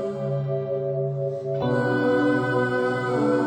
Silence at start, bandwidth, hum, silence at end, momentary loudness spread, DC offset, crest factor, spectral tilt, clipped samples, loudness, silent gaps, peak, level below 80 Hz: 0 s; 9 kHz; none; 0 s; 6 LU; under 0.1%; 12 dB; -8 dB/octave; under 0.1%; -24 LUFS; none; -12 dBFS; -60 dBFS